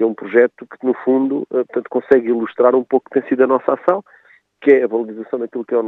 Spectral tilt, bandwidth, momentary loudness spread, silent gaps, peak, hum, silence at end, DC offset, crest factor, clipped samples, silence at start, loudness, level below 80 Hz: -8.5 dB/octave; 4 kHz; 9 LU; none; 0 dBFS; none; 0 s; under 0.1%; 16 dB; under 0.1%; 0 s; -17 LUFS; -68 dBFS